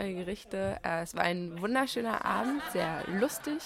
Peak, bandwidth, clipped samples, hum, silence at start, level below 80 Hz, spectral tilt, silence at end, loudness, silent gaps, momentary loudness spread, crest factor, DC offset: -12 dBFS; 16.5 kHz; under 0.1%; none; 0 s; -58 dBFS; -4.5 dB/octave; 0 s; -32 LUFS; none; 5 LU; 20 dB; under 0.1%